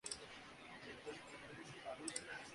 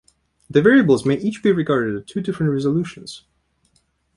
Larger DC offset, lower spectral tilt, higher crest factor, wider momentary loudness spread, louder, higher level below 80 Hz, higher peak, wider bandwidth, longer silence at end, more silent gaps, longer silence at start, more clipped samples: neither; second, -2 dB/octave vs -7 dB/octave; first, 28 dB vs 18 dB; second, 9 LU vs 17 LU; second, -51 LUFS vs -18 LUFS; second, -76 dBFS vs -54 dBFS; second, -24 dBFS vs -2 dBFS; about the same, 11.5 kHz vs 11.5 kHz; second, 0 s vs 1 s; neither; second, 0.05 s vs 0.5 s; neither